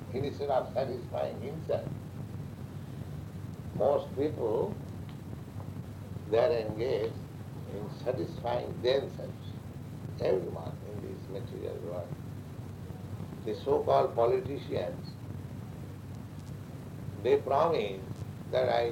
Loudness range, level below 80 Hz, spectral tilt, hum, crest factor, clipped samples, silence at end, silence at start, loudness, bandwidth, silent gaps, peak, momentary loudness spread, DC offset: 5 LU; -56 dBFS; -7.5 dB/octave; none; 20 dB; under 0.1%; 0 s; 0 s; -34 LUFS; 16 kHz; none; -14 dBFS; 15 LU; under 0.1%